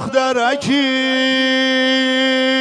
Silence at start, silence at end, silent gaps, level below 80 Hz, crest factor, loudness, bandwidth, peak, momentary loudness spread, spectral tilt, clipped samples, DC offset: 0 s; 0 s; none; -62 dBFS; 14 dB; -15 LUFS; 10.5 kHz; -2 dBFS; 2 LU; -3 dB/octave; under 0.1%; under 0.1%